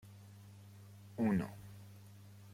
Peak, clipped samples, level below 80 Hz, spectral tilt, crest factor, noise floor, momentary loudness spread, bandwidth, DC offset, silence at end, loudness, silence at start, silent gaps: -24 dBFS; under 0.1%; -70 dBFS; -8 dB/octave; 18 dB; -57 dBFS; 22 LU; 16.5 kHz; under 0.1%; 0 s; -38 LUFS; 0.05 s; none